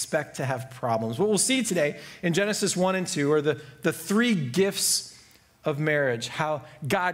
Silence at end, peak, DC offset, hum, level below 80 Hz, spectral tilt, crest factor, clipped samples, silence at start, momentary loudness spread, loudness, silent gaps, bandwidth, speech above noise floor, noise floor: 0 s; -8 dBFS; under 0.1%; none; -66 dBFS; -4 dB/octave; 18 dB; under 0.1%; 0 s; 8 LU; -26 LUFS; none; 16 kHz; 29 dB; -55 dBFS